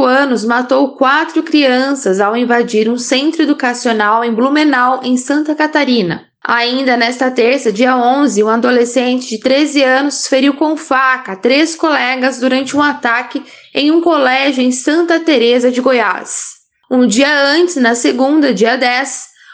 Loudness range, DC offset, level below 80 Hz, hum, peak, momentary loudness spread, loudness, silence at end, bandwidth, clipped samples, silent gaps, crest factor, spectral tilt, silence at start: 1 LU; under 0.1%; -64 dBFS; none; 0 dBFS; 5 LU; -12 LUFS; 0.3 s; 9.8 kHz; under 0.1%; none; 12 dB; -3 dB/octave; 0 s